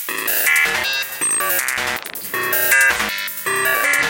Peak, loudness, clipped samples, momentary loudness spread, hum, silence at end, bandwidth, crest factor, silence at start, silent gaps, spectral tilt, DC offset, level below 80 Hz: 0 dBFS; -16 LUFS; under 0.1%; 9 LU; none; 0 s; 17.5 kHz; 18 dB; 0 s; none; 0 dB/octave; under 0.1%; -52 dBFS